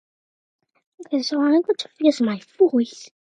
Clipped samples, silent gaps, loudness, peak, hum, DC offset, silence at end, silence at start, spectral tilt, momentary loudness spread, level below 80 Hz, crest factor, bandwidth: under 0.1%; none; -21 LUFS; -4 dBFS; none; under 0.1%; 0.25 s; 1 s; -5 dB/octave; 8 LU; -78 dBFS; 18 dB; 9.8 kHz